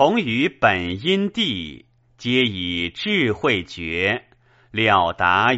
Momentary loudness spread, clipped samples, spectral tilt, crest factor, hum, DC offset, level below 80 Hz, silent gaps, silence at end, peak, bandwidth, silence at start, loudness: 10 LU; under 0.1%; -2.5 dB/octave; 20 dB; none; under 0.1%; -50 dBFS; none; 0 s; -2 dBFS; 8 kHz; 0 s; -20 LUFS